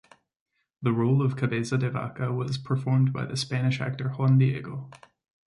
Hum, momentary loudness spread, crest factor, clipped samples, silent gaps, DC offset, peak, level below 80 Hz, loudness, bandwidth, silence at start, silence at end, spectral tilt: none; 8 LU; 16 dB; under 0.1%; none; under 0.1%; -10 dBFS; -62 dBFS; -26 LUFS; 11 kHz; 0.8 s; 0.5 s; -7 dB/octave